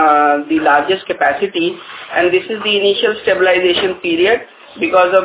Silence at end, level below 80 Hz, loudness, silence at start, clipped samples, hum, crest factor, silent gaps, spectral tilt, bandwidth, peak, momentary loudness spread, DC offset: 0 s; -54 dBFS; -14 LUFS; 0 s; under 0.1%; none; 14 dB; none; -7.5 dB/octave; 4 kHz; 0 dBFS; 7 LU; under 0.1%